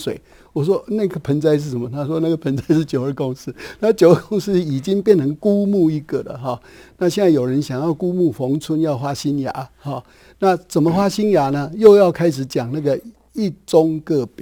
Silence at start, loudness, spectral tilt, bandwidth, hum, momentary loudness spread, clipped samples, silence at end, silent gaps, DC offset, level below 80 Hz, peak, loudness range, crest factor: 0 s; -18 LUFS; -7 dB/octave; 20 kHz; none; 13 LU; under 0.1%; 0 s; none; under 0.1%; -52 dBFS; 0 dBFS; 4 LU; 18 dB